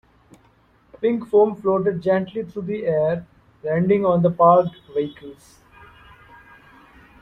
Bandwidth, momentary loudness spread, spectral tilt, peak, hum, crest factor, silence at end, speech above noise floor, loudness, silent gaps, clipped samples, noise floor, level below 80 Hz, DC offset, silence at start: 6.2 kHz; 14 LU; -9 dB/octave; -2 dBFS; none; 20 dB; 1.9 s; 37 dB; -20 LUFS; none; under 0.1%; -57 dBFS; -58 dBFS; under 0.1%; 1 s